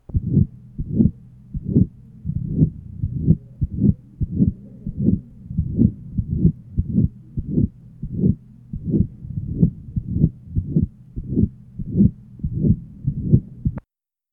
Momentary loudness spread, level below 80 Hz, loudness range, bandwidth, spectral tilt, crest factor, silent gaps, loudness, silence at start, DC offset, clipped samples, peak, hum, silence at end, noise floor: 12 LU; -32 dBFS; 1 LU; 1.5 kHz; -15 dB/octave; 20 dB; none; -22 LUFS; 0.1 s; under 0.1%; under 0.1%; 0 dBFS; none; 0.5 s; -73 dBFS